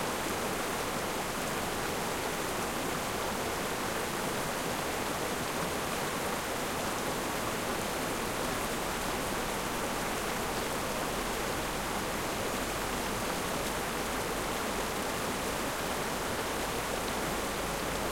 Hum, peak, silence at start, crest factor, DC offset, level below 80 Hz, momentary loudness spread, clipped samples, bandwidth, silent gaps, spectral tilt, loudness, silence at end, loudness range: none; -18 dBFS; 0 s; 14 dB; under 0.1%; -48 dBFS; 0 LU; under 0.1%; 16.5 kHz; none; -3 dB/octave; -33 LUFS; 0 s; 0 LU